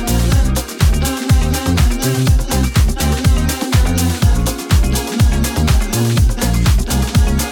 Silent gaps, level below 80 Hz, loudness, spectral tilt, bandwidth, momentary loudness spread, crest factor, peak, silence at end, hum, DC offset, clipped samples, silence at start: none; -16 dBFS; -15 LUFS; -5 dB/octave; 19 kHz; 2 LU; 12 dB; 0 dBFS; 0 s; none; under 0.1%; under 0.1%; 0 s